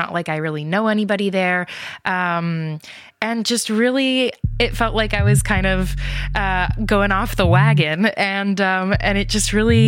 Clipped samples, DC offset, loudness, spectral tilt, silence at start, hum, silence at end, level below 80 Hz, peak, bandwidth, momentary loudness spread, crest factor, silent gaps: under 0.1%; under 0.1%; -18 LUFS; -5 dB/octave; 0 s; none; 0 s; -30 dBFS; 0 dBFS; 16.5 kHz; 8 LU; 18 dB; none